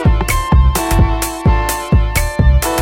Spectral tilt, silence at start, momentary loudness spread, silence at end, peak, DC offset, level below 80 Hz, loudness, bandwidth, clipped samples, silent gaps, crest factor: -5 dB/octave; 0 s; 3 LU; 0 s; 0 dBFS; under 0.1%; -14 dBFS; -14 LUFS; 17 kHz; under 0.1%; none; 12 dB